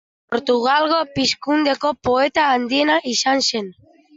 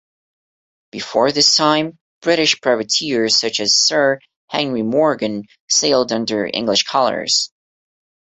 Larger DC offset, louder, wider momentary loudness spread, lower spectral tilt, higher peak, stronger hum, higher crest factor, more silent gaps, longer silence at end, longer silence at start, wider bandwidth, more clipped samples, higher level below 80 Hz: neither; about the same, -18 LUFS vs -16 LUFS; second, 6 LU vs 12 LU; about the same, -2.5 dB/octave vs -2 dB/octave; second, -6 dBFS vs 0 dBFS; neither; about the same, 14 dB vs 18 dB; second, none vs 2.01-2.21 s, 4.36-4.48 s, 5.60-5.68 s; second, 0.45 s vs 0.85 s; second, 0.3 s vs 0.95 s; about the same, 8 kHz vs 8.4 kHz; neither; first, -56 dBFS vs -62 dBFS